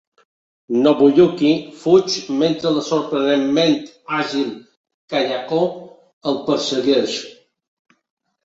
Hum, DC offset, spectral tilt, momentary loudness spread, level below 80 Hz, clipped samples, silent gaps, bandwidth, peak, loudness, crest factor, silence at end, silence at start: none; under 0.1%; -5 dB/octave; 11 LU; -62 dBFS; under 0.1%; 4.77-4.84 s, 4.94-5.08 s, 6.13-6.21 s; 8 kHz; -2 dBFS; -18 LUFS; 18 dB; 1.1 s; 0.7 s